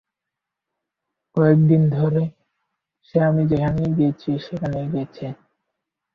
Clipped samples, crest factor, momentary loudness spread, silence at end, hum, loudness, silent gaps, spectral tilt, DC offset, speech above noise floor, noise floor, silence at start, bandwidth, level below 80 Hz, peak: under 0.1%; 18 dB; 13 LU; 0.8 s; none; -20 LUFS; none; -10.5 dB/octave; under 0.1%; 66 dB; -84 dBFS; 1.35 s; 5.2 kHz; -50 dBFS; -4 dBFS